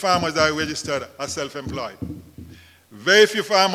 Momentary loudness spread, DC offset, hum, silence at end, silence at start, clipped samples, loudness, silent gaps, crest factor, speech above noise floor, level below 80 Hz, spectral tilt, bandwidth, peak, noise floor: 17 LU; under 0.1%; none; 0 s; 0 s; under 0.1%; -20 LUFS; none; 22 dB; 25 dB; -50 dBFS; -3 dB/octave; 16 kHz; 0 dBFS; -46 dBFS